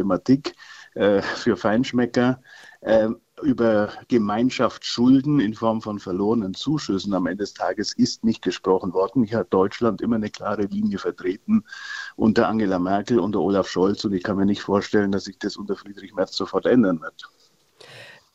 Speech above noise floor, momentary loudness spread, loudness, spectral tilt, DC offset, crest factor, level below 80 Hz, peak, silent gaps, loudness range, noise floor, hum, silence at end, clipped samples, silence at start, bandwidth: 31 dB; 10 LU; -22 LUFS; -6 dB/octave; under 0.1%; 18 dB; -54 dBFS; -4 dBFS; none; 3 LU; -53 dBFS; none; 0.25 s; under 0.1%; 0 s; 8 kHz